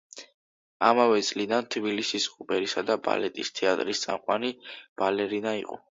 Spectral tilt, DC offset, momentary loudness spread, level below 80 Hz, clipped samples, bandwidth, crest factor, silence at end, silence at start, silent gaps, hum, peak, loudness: -3 dB/octave; under 0.1%; 10 LU; -72 dBFS; under 0.1%; 7.8 kHz; 22 dB; 0.15 s; 0.15 s; 0.34-0.80 s, 4.89-4.96 s; none; -6 dBFS; -27 LUFS